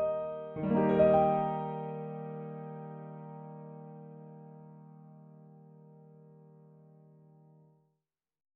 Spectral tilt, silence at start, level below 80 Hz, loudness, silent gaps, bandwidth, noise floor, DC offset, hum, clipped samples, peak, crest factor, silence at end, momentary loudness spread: -8 dB/octave; 0 s; -64 dBFS; -31 LUFS; none; 4.1 kHz; -86 dBFS; under 0.1%; none; under 0.1%; -12 dBFS; 22 dB; 2.25 s; 28 LU